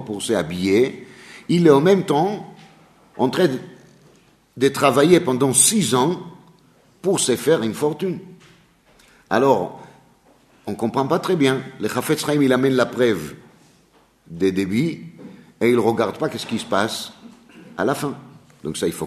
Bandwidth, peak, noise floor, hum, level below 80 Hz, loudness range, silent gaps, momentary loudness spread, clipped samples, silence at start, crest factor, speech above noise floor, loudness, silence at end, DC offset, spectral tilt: 13.5 kHz; -2 dBFS; -56 dBFS; none; -60 dBFS; 6 LU; none; 18 LU; under 0.1%; 0 s; 20 dB; 38 dB; -19 LUFS; 0 s; under 0.1%; -4.5 dB/octave